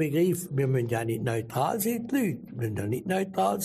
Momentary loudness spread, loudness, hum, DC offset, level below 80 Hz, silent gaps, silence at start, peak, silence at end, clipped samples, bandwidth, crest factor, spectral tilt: 5 LU; -28 LUFS; none; under 0.1%; -62 dBFS; none; 0 s; -14 dBFS; 0 s; under 0.1%; 15.5 kHz; 14 dB; -6 dB/octave